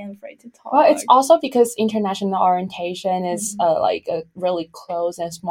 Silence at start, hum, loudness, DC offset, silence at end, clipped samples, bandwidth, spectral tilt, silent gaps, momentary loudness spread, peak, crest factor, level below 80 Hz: 0 s; none; -19 LUFS; under 0.1%; 0 s; under 0.1%; 16.5 kHz; -4.5 dB/octave; none; 13 LU; 0 dBFS; 18 dB; -66 dBFS